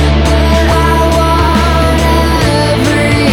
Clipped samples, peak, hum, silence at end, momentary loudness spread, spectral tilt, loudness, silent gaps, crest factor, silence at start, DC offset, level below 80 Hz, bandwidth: under 0.1%; 0 dBFS; none; 0 s; 1 LU; -5.5 dB/octave; -10 LUFS; none; 8 dB; 0 s; under 0.1%; -14 dBFS; 16.5 kHz